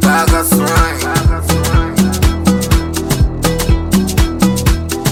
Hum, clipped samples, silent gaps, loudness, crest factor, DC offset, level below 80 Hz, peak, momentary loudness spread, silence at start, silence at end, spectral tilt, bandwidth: none; under 0.1%; none; -13 LUFS; 12 dB; under 0.1%; -18 dBFS; 0 dBFS; 4 LU; 0 s; 0 s; -5 dB/octave; 18.5 kHz